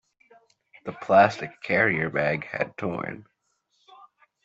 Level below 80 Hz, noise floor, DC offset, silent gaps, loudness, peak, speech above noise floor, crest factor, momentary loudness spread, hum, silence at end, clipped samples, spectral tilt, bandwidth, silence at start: -64 dBFS; -73 dBFS; under 0.1%; none; -24 LUFS; -4 dBFS; 49 dB; 22 dB; 19 LU; none; 1.25 s; under 0.1%; -6.5 dB/octave; 7.8 kHz; 0.85 s